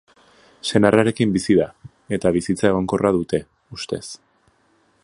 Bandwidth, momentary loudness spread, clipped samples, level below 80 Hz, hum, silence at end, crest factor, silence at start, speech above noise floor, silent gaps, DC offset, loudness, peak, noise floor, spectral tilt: 11.5 kHz; 15 LU; under 0.1%; -48 dBFS; none; 0.9 s; 20 dB; 0.65 s; 42 dB; none; under 0.1%; -20 LUFS; 0 dBFS; -61 dBFS; -6 dB/octave